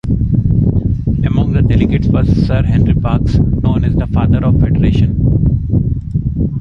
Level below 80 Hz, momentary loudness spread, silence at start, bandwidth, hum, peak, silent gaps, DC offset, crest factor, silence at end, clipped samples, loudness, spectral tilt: -18 dBFS; 4 LU; 0.05 s; 6.2 kHz; none; 0 dBFS; none; under 0.1%; 12 dB; 0 s; under 0.1%; -13 LUFS; -10 dB/octave